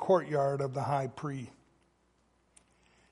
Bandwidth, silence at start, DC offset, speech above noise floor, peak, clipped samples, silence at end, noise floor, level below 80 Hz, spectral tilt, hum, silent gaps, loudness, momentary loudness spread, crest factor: 11.5 kHz; 0 s; under 0.1%; 40 dB; -12 dBFS; under 0.1%; 1.6 s; -71 dBFS; -70 dBFS; -7.5 dB/octave; none; none; -32 LUFS; 14 LU; 22 dB